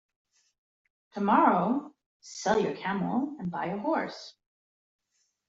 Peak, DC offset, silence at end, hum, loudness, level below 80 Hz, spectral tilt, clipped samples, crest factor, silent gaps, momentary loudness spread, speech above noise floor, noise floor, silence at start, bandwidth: -10 dBFS; under 0.1%; 1.2 s; none; -28 LUFS; -70 dBFS; -6 dB/octave; under 0.1%; 22 dB; 2.06-2.20 s; 20 LU; over 62 dB; under -90 dBFS; 1.15 s; 8 kHz